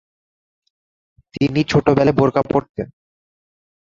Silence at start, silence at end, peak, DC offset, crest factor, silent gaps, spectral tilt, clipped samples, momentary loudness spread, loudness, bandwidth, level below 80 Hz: 1.35 s; 1.1 s; -2 dBFS; under 0.1%; 18 dB; 2.69-2.74 s; -7.5 dB/octave; under 0.1%; 16 LU; -17 LUFS; 7.6 kHz; -46 dBFS